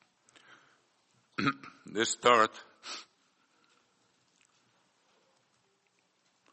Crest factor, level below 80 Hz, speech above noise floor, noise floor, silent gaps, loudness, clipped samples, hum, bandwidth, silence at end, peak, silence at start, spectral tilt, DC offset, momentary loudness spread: 28 dB; -82 dBFS; 45 dB; -74 dBFS; none; -30 LUFS; under 0.1%; none; 8.4 kHz; 3.5 s; -8 dBFS; 1.4 s; -3 dB/octave; under 0.1%; 20 LU